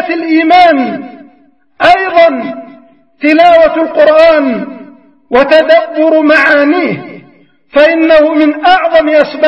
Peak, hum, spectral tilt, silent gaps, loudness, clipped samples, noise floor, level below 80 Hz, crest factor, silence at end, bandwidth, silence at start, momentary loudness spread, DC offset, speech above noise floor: 0 dBFS; none; -5.5 dB/octave; none; -7 LUFS; 1%; -48 dBFS; -44 dBFS; 8 dB; 0 s; 7.6 kHz; 0 s; 12 LU; 0.3%; 41 dB